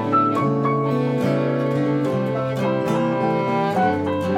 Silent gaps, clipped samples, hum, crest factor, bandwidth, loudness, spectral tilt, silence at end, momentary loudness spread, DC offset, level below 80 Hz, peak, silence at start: none; under 0.1%; none; 14 dB; 13.5 kHz; -21 LUFS; -8 dB/octave; 0 s; 3 LU; under 0.1%; -62 dBFS; -6 dBFS; 0 s